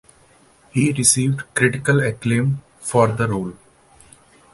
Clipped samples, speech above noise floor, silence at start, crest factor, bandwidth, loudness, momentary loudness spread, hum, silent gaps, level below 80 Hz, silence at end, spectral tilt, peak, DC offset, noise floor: under 0.1%; 35 dB; 0.75 s; 20 dB; 12 kHz; -19 LUFS; 11 LU; none; none; -50 dBFS; 1 s; -4.5 dB/octave; 0 dBFS; under 0.1%; -53 dBFS